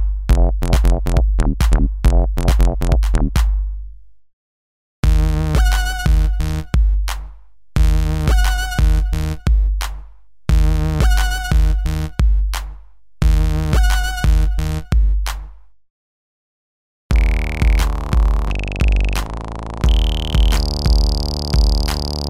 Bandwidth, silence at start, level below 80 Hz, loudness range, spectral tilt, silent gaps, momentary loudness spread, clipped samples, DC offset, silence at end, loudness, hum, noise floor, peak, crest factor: 15.5 kHz; 0 s; -16 dBFS; 3 LU; -5.5 dB/octave; 4.33-5.03 s, 15.90-17.09 s; 7 LU; under 0.1%; 1%; 0 s; -18 LUFS; none; -41 dBFS; 0 dBFS; 16 dB